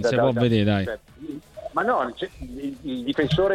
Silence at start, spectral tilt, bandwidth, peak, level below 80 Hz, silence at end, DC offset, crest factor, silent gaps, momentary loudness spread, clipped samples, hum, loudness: 0 s; -7 dB/octave; 13.5 kHz; -6 dBFS; -46 dBFS; 0 s; under 0.1%; 16 dB; none; 17 LU; under 0.1%; none; -24 LUFS